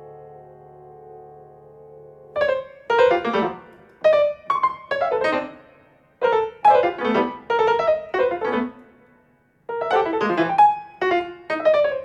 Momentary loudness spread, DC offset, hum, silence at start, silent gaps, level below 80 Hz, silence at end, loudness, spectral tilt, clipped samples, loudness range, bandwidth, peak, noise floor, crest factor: 11 LU; under 0.1%; none; 0 s; none; -60 dBFS; 0 s; -21 LUFS; -5.5 dB/octave; under 0.1%; 4 LU; 8.8 kHz; -4 dBFS; -59 dBFS; 16 dB